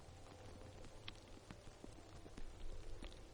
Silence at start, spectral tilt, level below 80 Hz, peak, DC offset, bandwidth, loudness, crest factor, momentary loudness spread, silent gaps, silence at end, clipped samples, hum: 0 s; -4.5 dB/octave; -56 dBFS; -30 dBFS; under 0.1%; 11 kHz; -58 LUFS; 22 dB; 4 LU; none; 0 s; under 0.1%; none